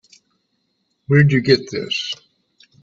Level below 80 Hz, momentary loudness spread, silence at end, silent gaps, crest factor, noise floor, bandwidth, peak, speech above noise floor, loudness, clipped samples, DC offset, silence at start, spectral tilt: -54 dBFS; 12 LU; 0.7 s; none; 20 dB; -69 dBFS; 7.6 kHz; 0 dBFS; 53 dB; -17 LUFS; under 0.1%; under 0.1%; 1.1 s; -6.5 dB/octave